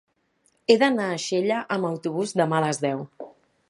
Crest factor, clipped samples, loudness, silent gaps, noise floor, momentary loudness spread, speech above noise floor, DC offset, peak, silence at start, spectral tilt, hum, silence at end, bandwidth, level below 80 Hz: 22 dB; under 0.1%; -24 LUFS; none; -68 dBFS; 15 LU; 45 dB; under 0.1%; -2 dBFS; 0.7 s; -5 dB/octave; none; 0.4 s; 11.5 kHz; -74 dBFS